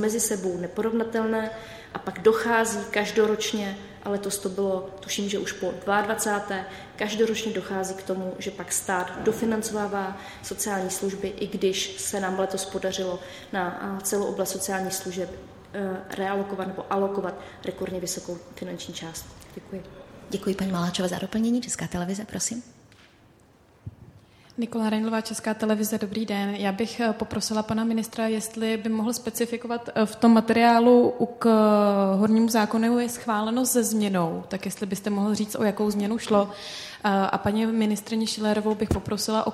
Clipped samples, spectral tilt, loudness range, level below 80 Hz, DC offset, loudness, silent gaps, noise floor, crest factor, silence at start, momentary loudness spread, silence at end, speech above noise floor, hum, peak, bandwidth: under 0.1%; -4.5 dB/octave; 10 LU; -56 dBFS; under 0.1%; -26 LUFS; none; -57 dBFS; 20 dB; 0 s; 14 LU; 0 s; 31 dB; none; -6 dBFS; 15.5 kHz